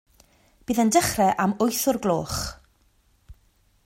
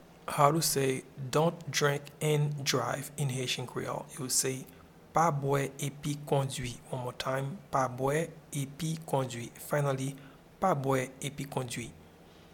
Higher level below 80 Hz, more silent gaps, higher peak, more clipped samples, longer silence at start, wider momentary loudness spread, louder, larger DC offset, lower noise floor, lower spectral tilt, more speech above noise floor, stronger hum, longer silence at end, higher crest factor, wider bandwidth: first, -50 dBFS vs -62 dBFS; neither; about the same, -6 dBFS vs -8 dBFS; neither; first, 0.7 s vs 0 s; about the same, 11 LU vs 10 LU; first, -23 LUFS vs -32 LUFS; neither; first, -63 dBFS vs -55 dBFS; about the same, -4 dB/octave vs -4.5 dB/octave; first, 40 dB vs 24 dB; neither; first, 0.55 s vs 0.1 s; about the same, 20 dB vs 24 dB; about the same, 16.5 kHz vs 18 kHz